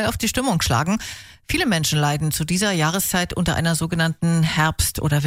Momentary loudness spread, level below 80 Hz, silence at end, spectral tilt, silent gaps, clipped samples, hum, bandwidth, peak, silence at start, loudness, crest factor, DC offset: 4 LU; -38 dBFS; 0 s; -4 dB/octave; none; under 0.1%; none; 16 kHz; -6 dBFS; 0 s; -20 LUFS; 14 dB; under 0.1%